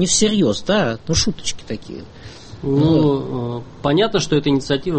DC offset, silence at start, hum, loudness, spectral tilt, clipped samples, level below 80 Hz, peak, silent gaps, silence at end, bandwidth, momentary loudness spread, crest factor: under 0.1%; 0 s; none; -18 LUFS; -4.5 dB/octave; under 0.1%; -38 dBFS; -4 dBFS; none; 0 s; 8.8 kHz; 17 LU; 14 dB